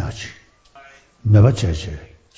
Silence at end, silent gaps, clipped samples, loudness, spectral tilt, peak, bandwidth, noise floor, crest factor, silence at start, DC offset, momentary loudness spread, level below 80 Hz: 0.35 s; none; under 0.1%; -17 LUFS; -7 dB/octave; -2 dBFS; 8 kHz; -48 dBFS; 18 dB; 0 s; under 0.1%; 21 LU; -34 dBFS